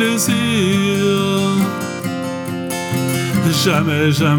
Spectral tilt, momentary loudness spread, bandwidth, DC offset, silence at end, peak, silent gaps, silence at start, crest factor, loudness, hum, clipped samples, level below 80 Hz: -5 dB/octave; 8 LU; 19.5 kHz; under 0.1%; 0 s; -2 dBFS; none; 0 s; 16 dB; -17 LUFS; none; under 0.1%; -58 dBFS